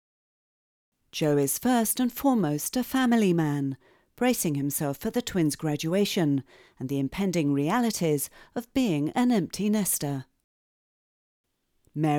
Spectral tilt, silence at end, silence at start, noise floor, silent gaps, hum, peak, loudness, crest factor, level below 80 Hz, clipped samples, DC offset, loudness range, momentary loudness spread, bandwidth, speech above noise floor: -5 dB/octave; 0 s; 1.15 s; -69 dBFS; 10.44-11.44 s; none; -10 dBFS; -26 LUFS; 16 dB; -60 dBFS; under 0.1%; under 0.1%; 3 LU; 8 LU; over 20 kHz; 43 dB